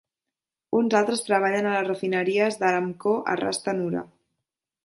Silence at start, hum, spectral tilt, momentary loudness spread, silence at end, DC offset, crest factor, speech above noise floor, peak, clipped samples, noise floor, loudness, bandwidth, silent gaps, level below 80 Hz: 0.7 s; none; -4.5 dB/octave; 5 LU; 0.8 s; under 0.1%; 18 dB; 64 dB; -8 dBFS; under 0.1%; -88 dBFS; -24 LUFS; 11.5 kHz; none; -70 dBFS